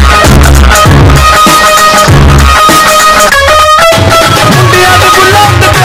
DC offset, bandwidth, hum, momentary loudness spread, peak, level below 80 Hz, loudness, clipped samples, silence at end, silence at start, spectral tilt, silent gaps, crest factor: under 0.1%; over 20 kHz; none; 1 LU; 0 dBFS; -10 dBFS; -2 LUFS; 10%; 0 s; 0 s; -4 dB/octave; none; 2 dB